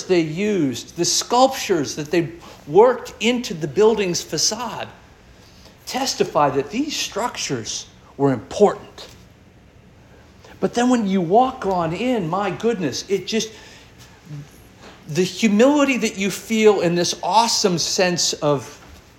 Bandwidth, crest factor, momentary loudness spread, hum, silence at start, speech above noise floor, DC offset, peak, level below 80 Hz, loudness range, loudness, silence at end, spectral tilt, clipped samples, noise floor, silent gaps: 17 kHz; 20 dB; 14 LU; none; 0 s; 29 dB; under 0.1%; -2 dBFS; -54 dBFS; 6 LU; -19 LUFS; 0.25 s; -4 dB/octave; under 0.1%; -48 dBFS; none